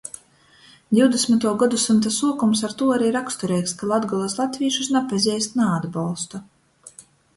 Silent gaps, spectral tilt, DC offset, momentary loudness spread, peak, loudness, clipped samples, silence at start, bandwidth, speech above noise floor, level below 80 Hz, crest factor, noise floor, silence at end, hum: none; -4.5 dB/octave; under 0.1%; 9 LU; -4 dBFS; -21 LUFS; under 0.1%; 0.05 s; 11.5 kHz; 33 dB; -62 dBFS; 18 dB; -53 dBFS; 0.35 s; none